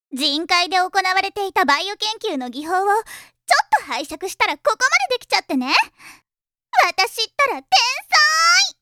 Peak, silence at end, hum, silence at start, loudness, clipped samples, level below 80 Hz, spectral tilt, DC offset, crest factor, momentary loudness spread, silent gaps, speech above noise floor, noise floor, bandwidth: 0 dBFS; 0.1 s; none; 0.1 s; -18 LUFS; under 0.1%; -62 dBFS; 0.5 dB/octave; under 0.1%; 18 dB; 11 LU; none; over 71 dB; under -90 dBFS; 17.5 kHz